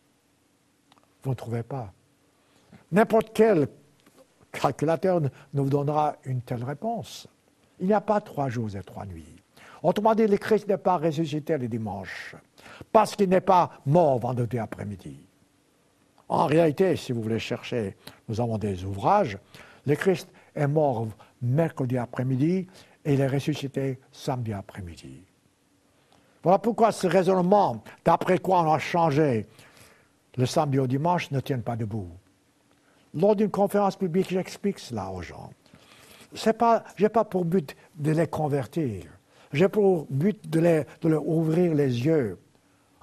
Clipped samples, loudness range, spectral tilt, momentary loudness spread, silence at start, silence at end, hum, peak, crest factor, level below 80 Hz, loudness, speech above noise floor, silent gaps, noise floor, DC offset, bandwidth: under 0.1%; 5 LU; -7 dB/octave; 15 LU; 1.25 s; 0.65 s; none; -4 dBFS; 22 dB; -60 dBFS; -25 LUFS; 41 dB; none; -66 dBFS; under 0.1%; 13.5 kHz